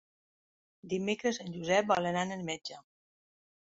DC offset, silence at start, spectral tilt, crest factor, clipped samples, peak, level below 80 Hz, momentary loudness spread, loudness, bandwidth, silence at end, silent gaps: under 0.1%; 0.85 s; -3.5 dB/octave; 20 dB; under 0.1%; -14 dBFS; -72 dBFS; 12 LU; -32 LUFS; 7.6 kHz; 0.9 s; none